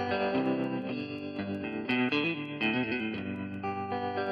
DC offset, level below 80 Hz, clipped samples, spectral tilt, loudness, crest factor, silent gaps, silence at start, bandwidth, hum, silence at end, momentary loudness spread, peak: under 0.1%; -68 dBFS; under 0.1%; -7.5 dB/octave; -32 LUFS; 16 dB; none; 0 s; 6.2 kHz; none; 0 s; 8 LU; -14 dBFS